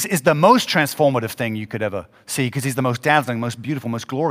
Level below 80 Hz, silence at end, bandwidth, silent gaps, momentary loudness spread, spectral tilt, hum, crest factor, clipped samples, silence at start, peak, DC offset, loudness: -62 dBFS; 0 s; 16 kHz; none; 12 LU; -5 dB/octave; none; 20 dB; under 0.1%; 0 s; 0 dBFS; under 0.1%; -19 LUFS